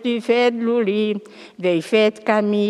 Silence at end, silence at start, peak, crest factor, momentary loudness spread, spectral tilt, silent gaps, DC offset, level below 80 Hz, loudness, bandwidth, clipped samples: 0 s; 0 s; -2 dBFS; 16 dB; 6 LU; -6 dB/octave; none; under 0.1%; -78 dBFS; -19 LUFS; 12 kHz; under 0.1%